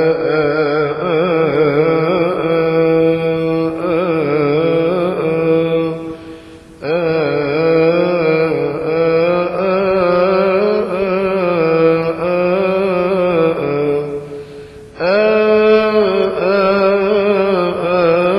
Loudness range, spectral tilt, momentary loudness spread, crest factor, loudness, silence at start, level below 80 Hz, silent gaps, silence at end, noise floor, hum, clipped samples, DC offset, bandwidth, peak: 3 LU; -8 dB/octave; 5 LU; 14 dB; -14 LUFS; 0 s; -46 dBFS; none; 0 s; -36 dBFS; none; under 0.1%; under 0.1%; 11.5 kHz; 0 dBFS